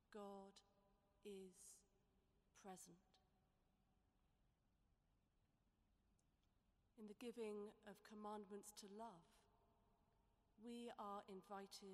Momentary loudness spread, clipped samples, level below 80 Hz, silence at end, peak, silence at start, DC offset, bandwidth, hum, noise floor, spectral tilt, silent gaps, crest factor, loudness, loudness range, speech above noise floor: 11 LU; under 0.1%; -86 dBFS; 0 s; -42 dBFS; 0.1 s; under 0.1%; 13 kHz; none; -85 dBFS; -4.5 dB/octave; none; 20 dB; -59 LUFS; 7 LU; 27 dB